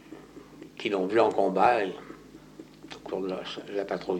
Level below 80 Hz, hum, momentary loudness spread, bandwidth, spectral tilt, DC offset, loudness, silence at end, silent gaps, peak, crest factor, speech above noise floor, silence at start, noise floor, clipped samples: -64 dBFS; none; 25 LU; 16.5 kHz; -5.5 dB/octave; under 0.1%; -27 LUFS; 0 s; none; -10 dBFS; 20 dB; 22 dB; 0.05 s; -48 dBFS; under 0.1%